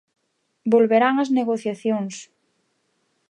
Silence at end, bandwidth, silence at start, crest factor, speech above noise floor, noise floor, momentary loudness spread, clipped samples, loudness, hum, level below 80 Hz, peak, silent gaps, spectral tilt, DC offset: 1.05 s; 9.8 kHz; 0.65 s; 18 dB; 50 dB; -70 dBFS; 14 LU; under 0.1%; -21 LUFS; none; -78 dBFS; -4 dBFS; none; -5.5 dB/octave; under 0.1%